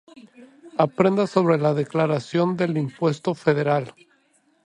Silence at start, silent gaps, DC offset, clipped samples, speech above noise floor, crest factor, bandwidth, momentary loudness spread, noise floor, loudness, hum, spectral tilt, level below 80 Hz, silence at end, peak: 0.4 s; none; under 0.1%; under 0.1%; 42 dB; 20 dB; 10.5 kHz; 5 LU; -63 dBFS; -22 LUFS; none; -7.5 dB/octave; -66 dBFS; 0.75 s; -4 dBFS